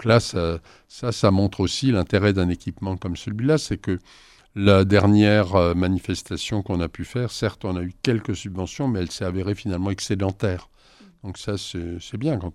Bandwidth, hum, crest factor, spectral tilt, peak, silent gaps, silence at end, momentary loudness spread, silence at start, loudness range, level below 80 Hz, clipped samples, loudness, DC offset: 12 kHz; none; 20 dB; -6 dB/octave; -2 dBFS; none; 0.05 s; 13 LU; 0 s; 7 LU; -44 dBFS; under 0.1%; -23 LUFS; under 0.1%